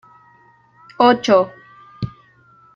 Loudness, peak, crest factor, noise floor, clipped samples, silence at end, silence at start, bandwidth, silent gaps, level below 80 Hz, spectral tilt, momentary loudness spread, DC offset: -15 LUFS; -2 dBFS; 18 dB; -52 dBFS; under 0.1%; 0.65 s; 1 s; 7.6 kHz; none; -54 dBFS; -5.5 dB/octave; 17 LU; under 0.1%